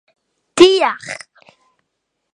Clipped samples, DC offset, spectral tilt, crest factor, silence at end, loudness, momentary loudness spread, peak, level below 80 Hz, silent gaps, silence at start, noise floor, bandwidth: 0.2%; under 0.1%; -3 dB/octave; 18 dB; 1.2 s; -13 LUFS; 20 LU; 0 dBFS; -58 dBFS; none; 0.55 s; -74 dBFS; 11 kHz